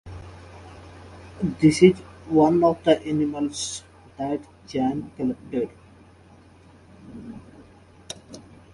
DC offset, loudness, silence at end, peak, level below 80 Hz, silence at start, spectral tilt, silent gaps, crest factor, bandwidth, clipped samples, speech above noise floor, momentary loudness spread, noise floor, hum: under 0.1%; -23 LUFS; 0.35 s; -2 dBFS; -52 dBFS; 0.05 s; -6 dB/octave; none; 24 dB; 11.5 kHz; under 0.1%; 30 dB; 26 LU; -51 dBFS; none